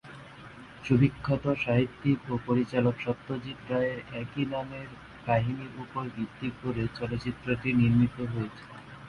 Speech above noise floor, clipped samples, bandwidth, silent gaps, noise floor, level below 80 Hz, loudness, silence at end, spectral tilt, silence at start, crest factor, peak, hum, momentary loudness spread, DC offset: 19 dB; under 0.1%; 10.5 kHz; none; -47 dBFS; -54 dBFS; -30 LUFS; 0 s; -8.5 dB/octave; 0.05 s; 20 dB; -10 dBFS; none; 17 LU; under 0.1%